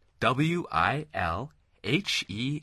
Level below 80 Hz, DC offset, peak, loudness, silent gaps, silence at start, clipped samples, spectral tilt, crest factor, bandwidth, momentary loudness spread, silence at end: -50 dBFS; under 0.1%; -10 dBFS; -28 LUFS; none; 0.2 s; under 0.1%; -5 dB/octave; 20 dB; 13 kHz; 9 LU; 0 s